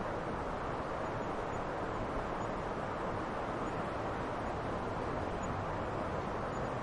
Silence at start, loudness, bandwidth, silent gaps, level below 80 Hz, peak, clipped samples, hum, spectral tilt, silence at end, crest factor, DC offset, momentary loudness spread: 0 s; -38 LUFS; 11.5 kHz; none; -50 dBFS; -24 dBFS; under 0.1%; none; -6.5 dB/octave; 0 s; 14 dB; under 0.1%; 1 LU